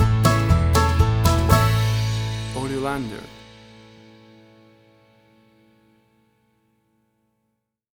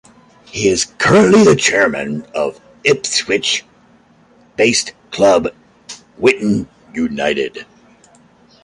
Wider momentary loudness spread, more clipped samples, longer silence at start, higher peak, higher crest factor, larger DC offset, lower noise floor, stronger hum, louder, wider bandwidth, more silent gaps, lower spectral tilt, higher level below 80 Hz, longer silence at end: second, 11 LU vs 17 LU; neither; second, 0 s vs 0.55 s; about the same, -2 dBFS vs 0 dBFS; about the same, 20 dB vs 16 dB; neither; first, -75 dBFS vs -49 dBFS; neither; second, -20 LUFS vs -14 LUFS; first, over 20 kHz vs 11.5 kHz; neither; first, -5.5 dB/octave vs -3.5 dB/octave; first, -30 dBFS vs -48 dBFS; first, 4.55 s vs 1 s